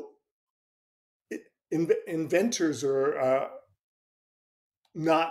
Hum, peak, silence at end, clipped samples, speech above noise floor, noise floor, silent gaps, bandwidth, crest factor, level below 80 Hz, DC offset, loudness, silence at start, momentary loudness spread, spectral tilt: none; -12 dBFS; 0 s; under 0.1%; over 64 dB; under -90 dBFS; 0.31-1.20 s, 3.83-4.72 s; 15 kHz; 18 dB; -76 dBFS; under 0.1%; -28 LUFS; 0 s; 16 LU; -4.5 dB/octave